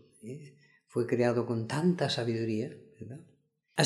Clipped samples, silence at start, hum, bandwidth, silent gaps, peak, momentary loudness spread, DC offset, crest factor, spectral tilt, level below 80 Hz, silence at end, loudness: under 0.1%; 0.25 s; none; 12 kHz; none; -10 dBFS; 19 LU; under 0.1%; 24 dB; -6 dB/octave; -74 dBFS; 0 s; -31 LUFS